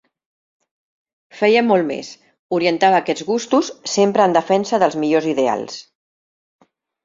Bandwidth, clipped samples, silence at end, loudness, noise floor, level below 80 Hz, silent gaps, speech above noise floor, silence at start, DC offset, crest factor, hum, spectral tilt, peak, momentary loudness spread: 7.8 kHz; under 0.1%; 1.25 s; -17 LUFS; under -90 dBFS; -66 dBFS; 2.39-2.49 s; over 73 dB; 1.35 s; under 0.1%; 16 dB; none; -4.5 dB/octave; -2 dBFS; 10 LU